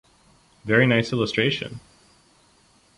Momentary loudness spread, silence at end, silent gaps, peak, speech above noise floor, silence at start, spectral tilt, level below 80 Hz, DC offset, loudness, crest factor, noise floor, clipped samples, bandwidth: 20 LU; 1.2 s; none; -2 dBFS; 37 dB; 0.65 s; -6 dB/octave; -56 dBFS; under 0.1%; -21 LUFS; 22 dB; -59 dBFS; under 0.1%; 11.5 kHz